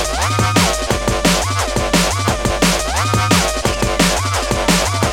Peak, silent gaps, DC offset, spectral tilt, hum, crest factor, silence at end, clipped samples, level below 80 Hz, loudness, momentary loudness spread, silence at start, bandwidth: 0 dBFS; none; 0.8%; -3.5 dB/octave; none; 16 dB; 0 s; under 0.1%; -26 dBFS; -15 LUFS; 4 LU; 0 s; 17 kHz